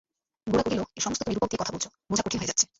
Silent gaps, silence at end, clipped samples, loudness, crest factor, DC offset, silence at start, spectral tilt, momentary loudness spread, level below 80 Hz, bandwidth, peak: none; 0.15 s; under 0.1%; -28 LUFS; 22 dB; under 0.1%; 0.45 s; -3 dB/octave; 5 LU; -52 dBFS; 8.2 kHz; -8 dBFS